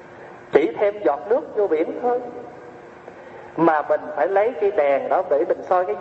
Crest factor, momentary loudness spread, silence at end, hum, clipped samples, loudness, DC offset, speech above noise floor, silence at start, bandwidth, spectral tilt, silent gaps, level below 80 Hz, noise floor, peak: 20 dB; 21 LU; 0 s; none; under 0.1%; -21 LUFS; under 0.1%; 21 dB; 0 s; 7.4 kHz; -7.5 dB/octave; none; -66 dBFS; -41 dBFS; 0 dBFS